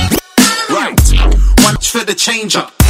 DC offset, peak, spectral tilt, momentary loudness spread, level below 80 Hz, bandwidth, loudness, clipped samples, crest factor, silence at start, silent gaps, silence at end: under 0.1%; 0 dBFS; -3.5 dB/octave; 5 LU; -14 dBFS; 16.5 kHz; -11 LUFS; 0.4%; 10 dB; 0 s; none; 0 s